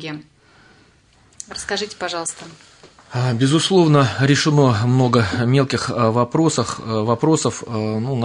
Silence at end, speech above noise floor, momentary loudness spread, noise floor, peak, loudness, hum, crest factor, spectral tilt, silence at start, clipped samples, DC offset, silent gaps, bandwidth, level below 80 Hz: 0 s; 36 dB; 14 LU; -54 dBFS; -2 dBFS; -18 LUFS; none; 16 dB; -5.5 dB/octave; 0 s; under 0.1%; under 0.1%; none; 11 kHz; -54 dBFS